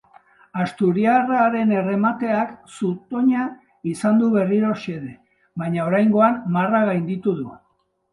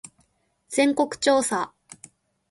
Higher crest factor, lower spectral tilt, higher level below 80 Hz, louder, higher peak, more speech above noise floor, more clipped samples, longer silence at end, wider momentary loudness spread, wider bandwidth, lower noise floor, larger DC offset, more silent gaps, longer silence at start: about the same, 18 dB vs 20 dB; first, -8 dB/octave vs -2.5 dB/octave; about the same, -64 dBFS vs -66 dBFS; first, -20 LUFS vs -23 LUFS; first, -2 dBFS vs -6 dBFS; about the same, 47 dB vs 45 dB; neither; second, 0.55 s vs 0.85 s; first, 13 LU vs 8 LU; about the same, 11.5 kHz vs 11.5 kHz; about the same, -67 dBFS vs -67 dBFS; neither; neither; second, 0.55 s vs 0.7 s